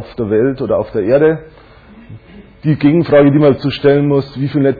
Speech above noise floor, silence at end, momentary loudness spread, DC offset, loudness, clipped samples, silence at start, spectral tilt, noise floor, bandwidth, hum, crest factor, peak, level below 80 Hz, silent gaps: 24 dB; 0 s; 8 LU; under 0.1%; -13 LUFS; under 0.1%; 0 s; -10.5 dB/octave; -36 dBFS; 4.9 kHz; none; 12 dB; 0 dBFS; -44 dBFS; none